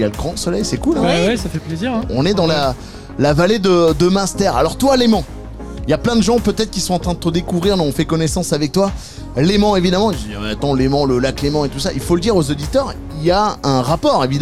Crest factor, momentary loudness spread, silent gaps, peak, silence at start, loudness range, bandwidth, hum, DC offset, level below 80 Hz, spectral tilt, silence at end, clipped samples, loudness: 12 dB; 8 LU; none; -4 dBFS; 0 s; 2 LU; 15.5 kHz; none; 1%; -32 dBFS; -5.5 dB/octave; 0 s; under 0.1%; -16 LUFS